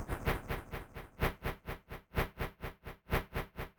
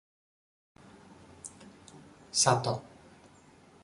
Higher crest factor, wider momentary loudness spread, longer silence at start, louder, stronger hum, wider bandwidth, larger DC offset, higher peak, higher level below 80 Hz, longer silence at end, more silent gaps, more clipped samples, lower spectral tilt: second, 22 dB vs 28 dB; second, 10 LU vs 27 LU; second, 0 s vs 1.45 s; second, -40 LUFS vs -28 LUFS; neither; first, over 20 kHz vs 11.5 kHz; neither; second, -18 dBFS vs -8 dBFS; first, -44 dBFS vs -68 dBFS; second, 0.1 s vs 1.05 s; neither; neither; first, -6 dB/octave vs -3 dB/octave